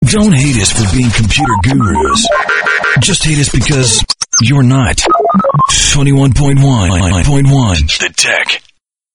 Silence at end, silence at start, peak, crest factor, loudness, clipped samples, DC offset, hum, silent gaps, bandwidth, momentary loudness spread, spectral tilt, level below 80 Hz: 0.55 s; 0 s; 0 dBFS; 10 dB; -9 LUFS; under 0.1%; under 0.1%; none; none; 11 kHz; 3 LU; -4 dB/octave; -22 dBFS